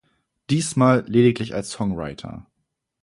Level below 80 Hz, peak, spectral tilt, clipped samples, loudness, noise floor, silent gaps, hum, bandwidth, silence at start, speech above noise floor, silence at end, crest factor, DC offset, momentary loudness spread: -52 dBFS; -4 dBFS; -6 dB/octave; under 0.1%; -21 LUFS; -77 dBFS; none; none; 11.5 kHz; 0.5 s; 56 dB; 0.6 s; 18 dB; under 0.1%; 19 LU